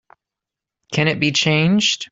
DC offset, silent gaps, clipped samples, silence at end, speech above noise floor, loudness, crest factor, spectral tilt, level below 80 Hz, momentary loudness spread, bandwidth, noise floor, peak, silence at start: under 0.1%; none; under 0.1%; 0.05 s; 69 dB; -17 LUFS; 16 dB; -4 dB/octave; -56 dBFS; 5 LU; 8 kHz; -86 dBFS; -2 dBFS; 0.9 s